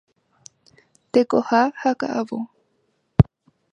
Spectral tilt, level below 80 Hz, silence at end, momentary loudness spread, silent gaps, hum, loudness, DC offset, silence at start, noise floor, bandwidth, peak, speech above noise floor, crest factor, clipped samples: -8 dB/octave; -40 dBFS; 0.5 s; 10 LU; none; none; -21 LUFS; under 0.1%; 1.15 s; -69 dBFS; 9.6 kHz; 0 dBFS; 49 dB; 22 dB; under 0.1%